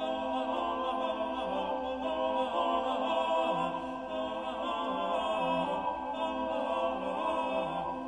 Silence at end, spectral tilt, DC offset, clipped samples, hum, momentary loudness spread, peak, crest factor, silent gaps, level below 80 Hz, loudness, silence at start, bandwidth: 0 s; -5.5 dB/octave; under 0.1%; under 0.1%; none; 5 LU; -18 dBFS; 14 dB; none; -60 dBFS; -33 LUFS; 0 s; 10.5 kHz